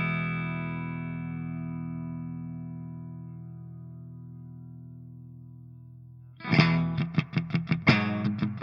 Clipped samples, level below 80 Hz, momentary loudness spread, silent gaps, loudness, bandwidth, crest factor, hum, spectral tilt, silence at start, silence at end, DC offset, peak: under 0.1%; -62 dBFS; 24 LU; none; -29 LUFS; 6.8 kHz; 26 dB; none; -7.5 dB/octave; 0 s; 0 s; under 0.1%; -4 dBFS